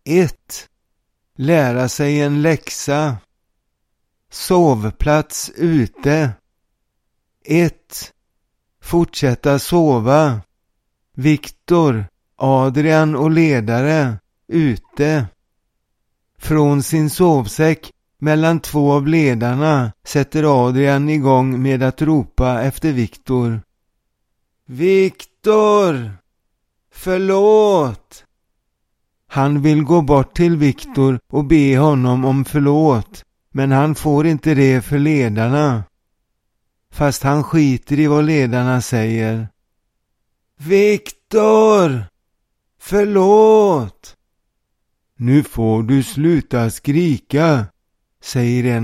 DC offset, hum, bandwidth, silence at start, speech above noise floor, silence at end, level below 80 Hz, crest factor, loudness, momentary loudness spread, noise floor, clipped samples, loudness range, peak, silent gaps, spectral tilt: under 0.1%; none; 15.5 kHz; 0.05 s; 55 dB; 0 s; -38 dBFS; 16 dB; -15 LUFS; 10 LU; -70 dBFS; under 0.1%; 4 LU; 0 dBFS; none; -7 dB/octave